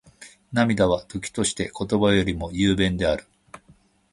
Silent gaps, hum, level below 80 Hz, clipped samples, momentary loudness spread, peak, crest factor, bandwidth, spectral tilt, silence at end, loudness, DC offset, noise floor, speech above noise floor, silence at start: none; none; -42 dBFS; under 0.1%; 9 LU; -4 dBFS; 20 dB; 11.5 kHz; -5 dB/octave; 0.55 s; -23 LUFS; under 0.1%; -57 dBFS; 35 dB; 0.2 s